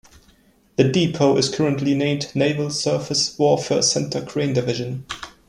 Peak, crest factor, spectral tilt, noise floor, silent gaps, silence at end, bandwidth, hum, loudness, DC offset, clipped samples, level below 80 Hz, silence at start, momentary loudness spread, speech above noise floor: -2 dBFS; 18 dB; -4.5 dB/octave; -56 dBFS; none; 0.2 s; 12.5 kHz; none; -20 LUFS; under 0.1%; under 0.1%; -54 dBFS; 0.8 s; 8 LU; 36 dB